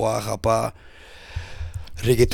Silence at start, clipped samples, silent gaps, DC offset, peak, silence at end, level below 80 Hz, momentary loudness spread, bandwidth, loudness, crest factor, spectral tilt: 0 s; under 0.1%; none; under 0.1%; -4 dBFS; 0 s; -38 dBFS; 16 LU; 18 kHz; -25 LUFS; 20 dB; -5.5 dB/octave